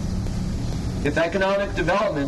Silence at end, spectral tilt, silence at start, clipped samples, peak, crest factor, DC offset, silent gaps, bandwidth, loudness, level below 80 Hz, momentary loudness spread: 0 s; -6 dB/octave; 0 s; under 0.1%; -8 dBFS; 14 dB; under 0.1%; none; 12 kHz; -24 LUFS; -32 dBFS; 6 LU